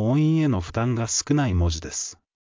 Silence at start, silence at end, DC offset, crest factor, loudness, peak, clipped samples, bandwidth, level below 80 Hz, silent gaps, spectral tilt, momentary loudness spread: 0 s; 0.4 s; under 0.1%; 14 dB; -23 LUFS; -8 dBFS; under 0.1%; 7.6 kHz; -34 dBFS; none; -5.5 dB/octave; 9 LU